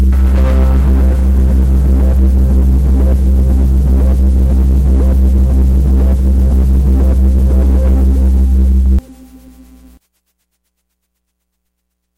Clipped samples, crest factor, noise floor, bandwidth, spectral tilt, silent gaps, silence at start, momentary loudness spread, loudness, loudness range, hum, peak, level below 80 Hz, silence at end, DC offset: under 0.1%; 6 dB; -69 dBFS; 2.8 kHz; -9 dB/octave; none; 0 s; 1 LU; -11 LUFS; 5 LU; none; -4 dBFS; -10 dBFS; 3.05 s; under 0.1%